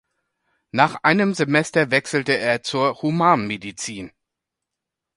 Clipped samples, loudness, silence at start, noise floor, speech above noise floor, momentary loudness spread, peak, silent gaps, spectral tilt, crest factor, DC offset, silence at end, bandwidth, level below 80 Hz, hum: under 0.1%; -20 LUFS; 0.75 s; -84 dBFS; 64 dB; 12 LU; 0 dBFS; none; -5 dB/octave; 22 dB; under 0.1%; 1.1 s; 11.5 kHz; -62 dBFS; none